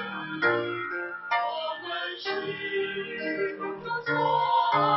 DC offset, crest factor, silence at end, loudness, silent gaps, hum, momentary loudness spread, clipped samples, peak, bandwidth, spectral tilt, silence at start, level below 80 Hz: under 0.1%; 16 dB; 0 s; -28 LUFS; none; none; 9 LU; under 0.1%; -12 dBFS; 6 kHz; -6.5 dB/octave; 0 s; -74 dBFS